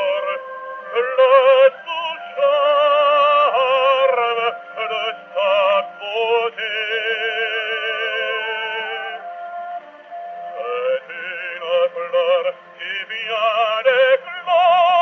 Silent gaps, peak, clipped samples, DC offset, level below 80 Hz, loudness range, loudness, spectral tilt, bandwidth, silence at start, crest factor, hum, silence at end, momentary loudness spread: none; -2 dBFS; under 0.1%; under 0.1%; -84 dBFS; 9 LU; -18 LUFS; 3.5 dB/octave; 6.2 kHz; 0 s; 16 dB; none; 0 s; 15 LU